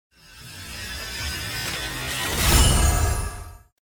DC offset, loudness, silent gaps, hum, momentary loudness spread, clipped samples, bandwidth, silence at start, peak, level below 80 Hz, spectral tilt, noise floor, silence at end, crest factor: under 0.1%; -23 LUFS; none; none; 20 LU; under 0.1%; 19 kHz; 0.3 s; -4 dBFS; -28 dBFS; -3 dB/octave; -43 dBFS; 0.3 s; 20 dB